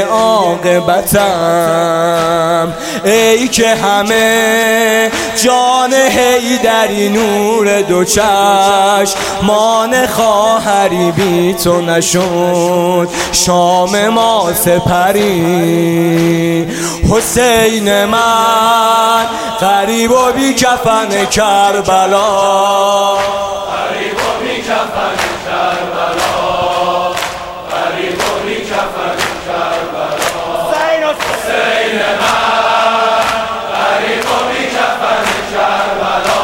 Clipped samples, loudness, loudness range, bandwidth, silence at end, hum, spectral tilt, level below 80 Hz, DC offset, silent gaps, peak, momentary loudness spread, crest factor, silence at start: under 0.1%; -11 LUFS; 5 LU; 17 kHz; 0 s; none; -3.5 dB/octave; -38 dBFS; under 0.1%; none; 0 dBFS; 7 LU; 12 dB; 0 s